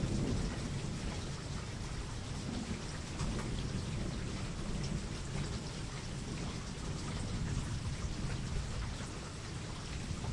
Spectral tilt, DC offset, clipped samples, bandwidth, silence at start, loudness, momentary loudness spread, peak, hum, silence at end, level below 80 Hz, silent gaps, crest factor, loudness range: -5 dB/octave; under 0.1%; under 0.1%; 11.5 kHz; 0 s; -40 LUFS; 4 LU; -24 dBFS; none; 0 s; -44 dBFS; none; 16 dB; 1 LU